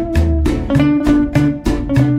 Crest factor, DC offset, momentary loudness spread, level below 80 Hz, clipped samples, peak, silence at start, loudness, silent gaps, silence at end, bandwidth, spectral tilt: 12 dB; under 0.1%; 4 LU; -22 dBFS; under 0.1%; 0 dBFS; 0 s; -15 LUFS; none; 0 s; 13 kHz; -8 dB/octave